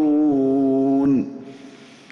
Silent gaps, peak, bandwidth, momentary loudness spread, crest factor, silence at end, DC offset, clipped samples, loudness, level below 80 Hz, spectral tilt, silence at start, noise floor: none; -12 dBFS; 6.4 kHz; 17 LU; 8 dB; 0.35 s; under 0.1%; under 0.1%; -19 LUFS; -60 dBFS; -9 dB/octave; 0 s; -43 dBFS